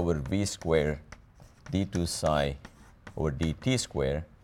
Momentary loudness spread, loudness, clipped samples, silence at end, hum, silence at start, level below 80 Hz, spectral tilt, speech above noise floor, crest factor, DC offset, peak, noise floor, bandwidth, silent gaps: 7 LU; -30 LUFS; under 0.1%; 0.15 s; none; 0 s; -44 dBFS; -5.5 dB/octave; 25 dB; 18 dB; under 0.1%; -12 dBFS; -54 dBFS; 16.5 kHz; none